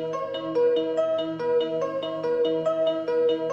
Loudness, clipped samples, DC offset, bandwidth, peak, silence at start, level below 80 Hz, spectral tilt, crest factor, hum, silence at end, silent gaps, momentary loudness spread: -25 LUFS; under 0.1%; under 0.1%; 7.8 kHz; -14 dBFS; 0 s; -70 dBFS; -6 dB/octave; 10 dB; none; 0 s; none; 6 LU